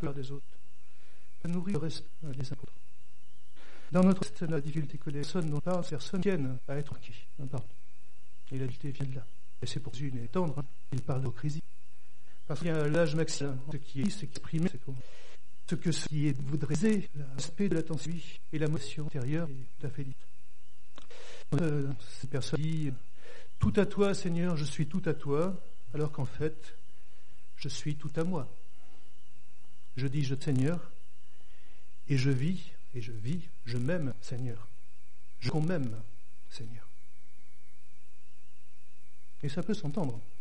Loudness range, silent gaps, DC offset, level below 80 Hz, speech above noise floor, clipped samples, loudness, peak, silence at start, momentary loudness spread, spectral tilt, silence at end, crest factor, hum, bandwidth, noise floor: 8 LU; none; 4%; -58 dBFS; 33 dB; under 0.1%; -34 LUFS; -14 dBFS; 0 s; 16 LU; -6.5 dB/octave; 0.15 s; 20 dB; 50 Hz at -55 dBFS; 10.5 kHz; -66 dBFS